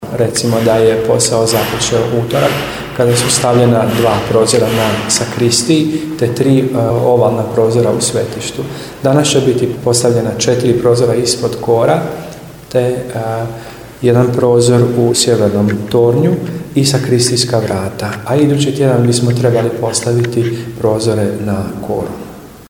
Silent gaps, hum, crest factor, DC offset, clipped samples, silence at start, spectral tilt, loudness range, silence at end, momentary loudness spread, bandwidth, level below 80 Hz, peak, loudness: none; none; 12 dB; under 0.1%; under 0.1%; 0 s; -5 dB/octave; 3 LU; 0.05 s; 9 LU; 18.5 kHz; -42 dBFS; 0 dBFS; -12 LUFS